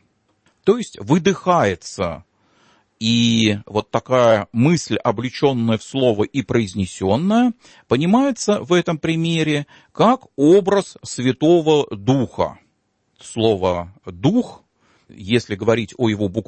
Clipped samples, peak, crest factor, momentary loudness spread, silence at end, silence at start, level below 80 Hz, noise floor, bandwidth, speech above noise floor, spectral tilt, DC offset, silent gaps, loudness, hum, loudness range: under 0.1%; -2 dBFS; 16 dB; 9 LU; 0.05 s; 0.65 s; -54 dBFS; -67 dBFS; 8.8 kHz; 49 dB; -6 dB/octave; under 0.1%; none; -18 LUFS; none; 4 LU